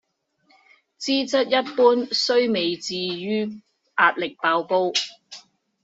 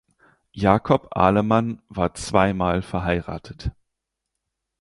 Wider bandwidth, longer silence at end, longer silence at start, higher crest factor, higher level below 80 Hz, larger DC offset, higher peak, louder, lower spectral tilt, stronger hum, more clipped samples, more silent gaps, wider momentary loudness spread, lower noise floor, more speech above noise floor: second, 8 kHz vs 11.5 kHz; second, 0.45 s vs 1.1 s; first, 1 s vs 0.55 s; about the same, 20 dB vs 20 dB; second, -72 dBFS vs -40 dBFS; neither; about the same, -4 dBFS vs -2 dBFS; about the same, -22 LUFS vs -21 LUFS; second, -3 dB/octave vs -6.5 dB/octave; neither; neither; neither; about the same, 13 LU vs 14 LU; second, -65 dBFS vs -82 dBFS; second, 44 dB vs 60 dB